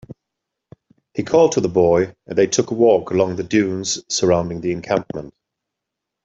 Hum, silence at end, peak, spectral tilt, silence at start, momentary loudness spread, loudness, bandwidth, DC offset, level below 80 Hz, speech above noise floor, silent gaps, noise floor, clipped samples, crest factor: none; 0.95 s; -2 dBFS; -4.5 dB/octave; 0.1 s; 9 LU; -18 LUFS; 8.2 kHz; under 0.1%; -54 dBFS; 64 dB; none; -82 dBFS; under 0.1%; 16 dB